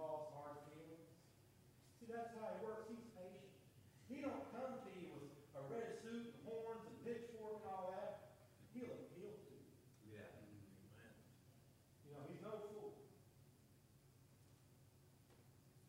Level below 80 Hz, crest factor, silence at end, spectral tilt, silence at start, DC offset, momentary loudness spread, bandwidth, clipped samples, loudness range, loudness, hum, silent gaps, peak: -84 dBFS; 20 dB; 0 s; -6.5 dB/octave; 0 s; under 0.1%; 18 LU; 16 kHz; under 0.1%; 8 LU; -54 LUFS; none; none; -36 dBFS